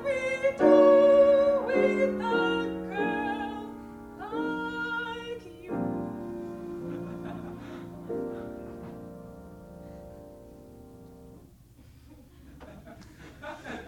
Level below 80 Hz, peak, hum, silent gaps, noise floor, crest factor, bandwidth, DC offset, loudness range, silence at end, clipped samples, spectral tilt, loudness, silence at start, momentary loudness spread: -56 dBFS; -8 dBFS; none; none; -54 dBFS; 20 dB; 10 kHz; under 0.1%; 26 LU; 0 s; under 0.1%; -6.5 dB/octave; -26 LUFS; 0 s; 27 LU